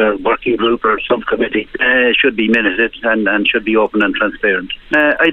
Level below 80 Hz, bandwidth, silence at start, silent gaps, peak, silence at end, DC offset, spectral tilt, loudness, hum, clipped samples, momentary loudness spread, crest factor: -42 dBFS; 6.8 kHz; 0 s; none; 0 dBFS; 0 s; under 0.1%; -6 dB/octave; -14 LUFS; none; under 0.1%; 5 LU; 14 dB